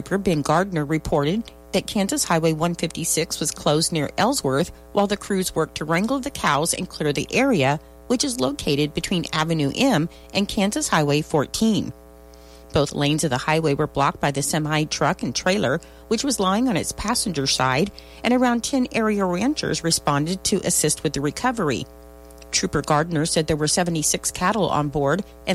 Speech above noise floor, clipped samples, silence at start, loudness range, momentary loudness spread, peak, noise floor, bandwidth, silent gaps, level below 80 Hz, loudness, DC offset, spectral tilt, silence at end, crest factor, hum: 23 dB; under 0.1%; 0 s; 1 LU; 5 LU; -6 dBFS; -45 dBFS; 16 kHz; none; -44 dBFS; -22 LUFS; under 0.1%; -4 dB/octave; 0 s; 16 dB; none